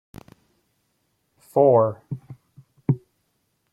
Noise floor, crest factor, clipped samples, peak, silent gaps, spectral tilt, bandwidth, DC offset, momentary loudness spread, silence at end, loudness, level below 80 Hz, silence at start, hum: -72 dBFS; 20 dB; under 0.1%; -6 dBFS; none; -10.5 dB/octave; 13 kHz; under 0.1%; 19 LU; 0.75 s; -21 LUFS; -62 dBFS; 1.55 s; none